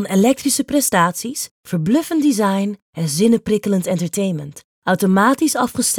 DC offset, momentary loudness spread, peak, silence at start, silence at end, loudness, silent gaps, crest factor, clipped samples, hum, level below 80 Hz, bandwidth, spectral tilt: under 0.1%; 10 LU; -2 dBFS; 0 s; 0 s; -17 LUFS; 1.51-1.64 s, 2.82-2.93 s, 4.64-4.82 s; 16 dB; under 0.1%; none; -56 dBFS; 19 kHz; -4.5 dB/octave